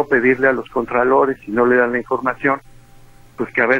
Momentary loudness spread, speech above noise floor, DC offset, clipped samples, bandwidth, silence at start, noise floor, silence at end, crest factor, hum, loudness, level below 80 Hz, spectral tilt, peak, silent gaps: 7 LU; 27 dB; under 0.1%; under 0.1%; 7.4 kHz; 0 s; -44 dBFS; 0 s; 16 dB; none; -17 LUFS; -48 dBFS; -7.5 dB/octave; -2 dBFS; none